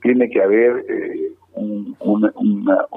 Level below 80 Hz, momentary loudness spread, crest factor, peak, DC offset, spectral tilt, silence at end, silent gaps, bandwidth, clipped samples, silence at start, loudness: -72 dBFS; 12 LU; 14 dB; -4 dBFS; under 0.1%; -10.5 dB/octave; 0 s; none; 3.7 kHz; under 0.1%; 0 s; -18 LUFS